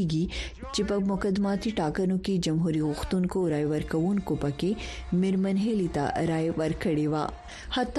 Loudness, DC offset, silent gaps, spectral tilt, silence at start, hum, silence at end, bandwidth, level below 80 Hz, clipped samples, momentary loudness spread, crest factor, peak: -28 LUFS; under 0.1%; none; -6.5 dB/octave; 0 s; none; 0 s; 12.5 kHz; -44 dBFS; under 0.1%; 5 LU; 14 dB; -14 dBFS